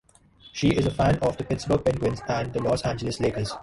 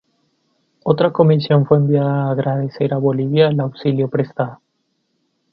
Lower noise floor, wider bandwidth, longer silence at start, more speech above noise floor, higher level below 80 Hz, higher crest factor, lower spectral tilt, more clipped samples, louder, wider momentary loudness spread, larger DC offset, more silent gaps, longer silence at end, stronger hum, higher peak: second, -54 dBFS vs -69 dBFS; first, 11.5 kHz vs 5.4 kHz; second, 0.45 s vs 0.85 s; second, 29 dB vs 53 dB; first, -42 dBFS vs -58 dBFS; about the same, 16 dB vs 16 dB; second, -6.5 dB/octave vs -11 dB/octave; neither; second, -25 LUFS vs -17 LUFS; about the same, 6 LU vs 7 LU; neither; neither; second, 0 s vs 1 s; neither; second, -10 dBFS vs 0 dBFS